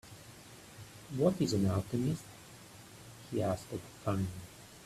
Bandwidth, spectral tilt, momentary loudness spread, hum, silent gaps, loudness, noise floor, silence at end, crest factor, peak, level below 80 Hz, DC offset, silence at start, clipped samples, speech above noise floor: 15 kHz; -6.5 dB/octave; 21 LU; none; none; -35 LUFS; -54 dBFS; 0 s; 20 dB; -16 dBFS; -62 dBFS; under 0.1%; 0.05 s; under 0.1%; 20 dB